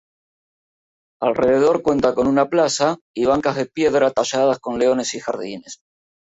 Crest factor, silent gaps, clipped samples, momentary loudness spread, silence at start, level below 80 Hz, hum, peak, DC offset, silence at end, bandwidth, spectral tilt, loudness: 16 dB; 3.01-3.14 s; under 0.1%; 10 LU; 1.2 s; -54 dBFS; none; -4 dBFS; under 0.1%; 0.55 s; 8 kHz; -4.5 dB/octave; -19 LUFS